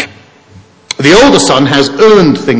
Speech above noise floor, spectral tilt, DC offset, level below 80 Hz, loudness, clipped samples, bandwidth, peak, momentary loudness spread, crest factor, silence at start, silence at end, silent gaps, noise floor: 33 dB; -4.5 dB/octave; under 0.1%; -36 dBFS; -6 LUFS; 2%; 8 kHz; 0 dBFS; 11 LU; 8 dB; 0 s; 0 s; none; -38 dBFS